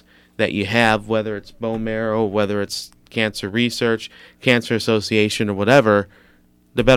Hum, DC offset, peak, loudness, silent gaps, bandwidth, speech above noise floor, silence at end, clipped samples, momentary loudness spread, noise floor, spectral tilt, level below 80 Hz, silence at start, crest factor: 60 Hz at -45 dBFS; under 0.1%; 0 dBFS; -19 LUFS; none; 16 kHz; 35 dB; 0 s; under 0.1%; 12 LU; -54 dBFS; -5 dB/octave; -44 dBFS; 0.4 s; 20 dB